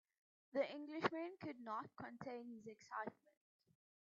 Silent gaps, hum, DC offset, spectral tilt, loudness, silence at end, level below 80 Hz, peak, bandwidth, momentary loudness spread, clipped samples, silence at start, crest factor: none; none; under 0.1%; -3.5 dB/octave; -48 LUFS; 0.95 s; -90 dBFS; -22 dBFS; 7.4 kHz; 10 LU; under 0.1%; 0.55 s; 26 dB